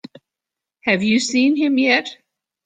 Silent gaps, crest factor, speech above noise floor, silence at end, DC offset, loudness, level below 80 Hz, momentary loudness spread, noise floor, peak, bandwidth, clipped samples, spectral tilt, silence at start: none; 18 dB; 69 dB; 0.5 s; under 0.1%; -17 LUFS; -64 dBFS; 7 LU; -86 dBFS; -2 dBFS; 9.4 kHz; under 0.1%; -4 dB/octave; 0.85 s